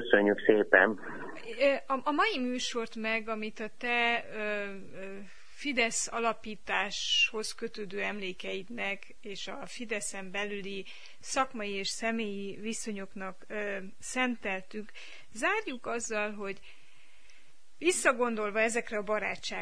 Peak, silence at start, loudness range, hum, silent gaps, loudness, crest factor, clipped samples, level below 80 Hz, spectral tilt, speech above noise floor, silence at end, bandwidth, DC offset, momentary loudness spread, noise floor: -6 dBFS; 0 s; 6 LU; none; none; -31 LUFS; 26 dB; under 0.1%; -64 dBFS; -2.5 dB/octave; 31 dB; 0 s; 10.5 kHz; 0.8%; 16 LU; -63 dBFS